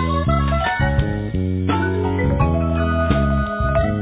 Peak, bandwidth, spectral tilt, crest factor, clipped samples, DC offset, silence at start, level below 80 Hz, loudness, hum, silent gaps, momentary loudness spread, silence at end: -4 dBFS; 4 kHz; -11.5 dB/octave; 14 dB; under 0.1%; under 0.1%; 0 s; -24 dBFS; -19 LUFS; none; none; 3 LU; 0 s